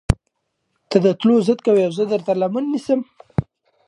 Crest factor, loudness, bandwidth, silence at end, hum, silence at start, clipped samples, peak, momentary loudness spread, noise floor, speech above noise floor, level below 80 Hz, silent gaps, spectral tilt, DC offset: 20 dB; -19 LUFS; 11.5 kHz; 0.45 s; none; 0.1 s; under 0.1%; 0 dBFS; 10 LU; -73 dBFS; 56 dB; -36 dBFS; none; -7.5 dB/octave; under 0.1%